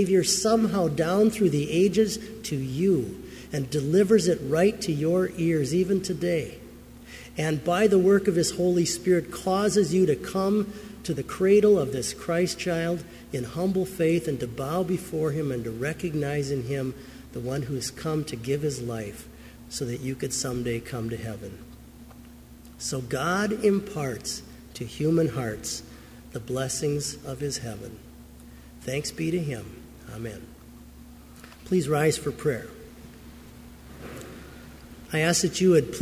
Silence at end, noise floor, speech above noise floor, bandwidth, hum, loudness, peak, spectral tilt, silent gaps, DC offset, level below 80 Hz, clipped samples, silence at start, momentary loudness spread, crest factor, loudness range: 0 s; -47 dBFS; 22 dB; 16 kHz; none; -26 LUFS; -8 dBFS; -5 dB/octave; none; under 0.1%; -50 dBFS; under 0.1%; 0 s; 22 LU; 18 dB; 9 LU